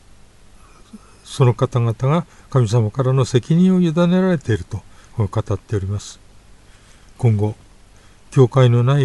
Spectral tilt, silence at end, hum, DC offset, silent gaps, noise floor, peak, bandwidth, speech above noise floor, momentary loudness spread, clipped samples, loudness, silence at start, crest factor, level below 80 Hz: -7.5 dB/octave; 0 s; 50 Hz at -40 dBFS; under 0.1%; none; -46 dBFS; -2 dBFS; 11.5 kHz; 30 dB; 14 LU; under 0.1%; -18 LUFS; 0.95 s; 18 dB; -46 dBFS